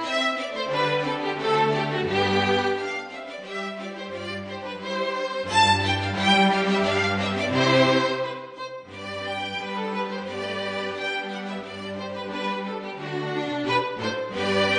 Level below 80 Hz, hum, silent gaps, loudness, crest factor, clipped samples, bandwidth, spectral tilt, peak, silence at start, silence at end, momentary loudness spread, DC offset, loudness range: -62 dBFS; none; none; -25 LUFS; 18 dB; under 0.1%; 10 kHz; -4.5 dB/octave; -6 dBFS; 0 s; 0 s; 14 LU; under 0.1%; 9 LU